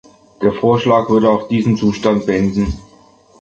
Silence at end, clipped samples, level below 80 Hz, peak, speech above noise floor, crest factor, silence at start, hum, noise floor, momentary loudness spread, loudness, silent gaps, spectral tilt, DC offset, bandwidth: 0.6 s; under 0.1%; -36 dBFS; 0 dBFS; 33 dB; 14 dB; 0.4 s; none; -47 dBFS; 7 LU; -15 LUFS; none; -7.5 dB/octave; under 0.1%; 7.6 kHz